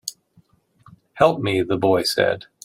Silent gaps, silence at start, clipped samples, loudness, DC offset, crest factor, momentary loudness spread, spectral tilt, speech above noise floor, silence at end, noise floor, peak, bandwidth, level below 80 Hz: none; 0.05 s; under 0.1%; -19 LUFS; under 0.1%; 20 dB; 4 LU; -4.5 dB/octave; 39 dB; 0.25 s; -59 dBFS; -2 dBFS; 16 kHz; -58 dBFS